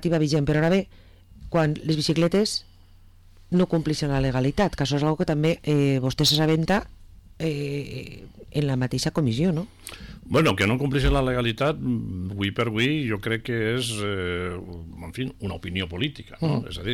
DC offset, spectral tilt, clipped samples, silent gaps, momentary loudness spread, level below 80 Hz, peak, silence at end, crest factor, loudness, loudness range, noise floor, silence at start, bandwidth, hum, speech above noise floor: under 0.1%; -5.5 dB/octave; under 0.1%; none; 11 LU; -40 dBFS; -12 dBFS; 0 s; 14 dB; -24 LUFS; 5 LU; -50 dBFS; 0 s; 16.5 kHz; none; 26 dB